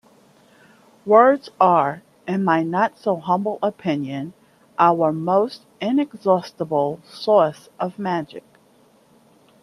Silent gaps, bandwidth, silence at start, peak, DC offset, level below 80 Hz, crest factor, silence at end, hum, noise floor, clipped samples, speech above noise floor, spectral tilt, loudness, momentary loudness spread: none; 12.5 kHz; 1.05 s; 0 dBFS; under 0.1%; -68 dBFS; 20 dB; 1.25 s; none; -55 dBFS; under 0.1%; 36 dB; -7.5 dB/octave; -20 LUFS; 13 LU